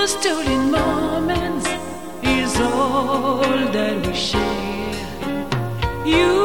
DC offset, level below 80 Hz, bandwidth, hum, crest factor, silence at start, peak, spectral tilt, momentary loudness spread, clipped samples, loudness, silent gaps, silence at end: 1%; -36 dBFS; 18 kHz; none; 16 dB; 0 s; -4 dBFS; -4.5 dB/octave; 8 LU; under 0.1%; -20 LUFS; none; 0 s